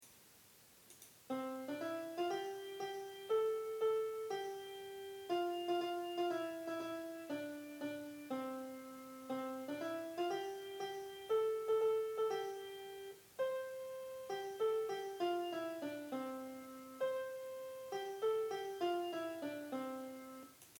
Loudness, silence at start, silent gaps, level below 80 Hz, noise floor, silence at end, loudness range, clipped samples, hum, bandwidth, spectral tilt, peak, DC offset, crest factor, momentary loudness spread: -42 LUFS; 0 s; none; -86 dBFS; -65 dBFS; 0 s; 4 LU; under 0.1%; none; 19.5 kHz; -4 dB/octave; -28 dBFS; under 0.1%; 14 dB; 13 LU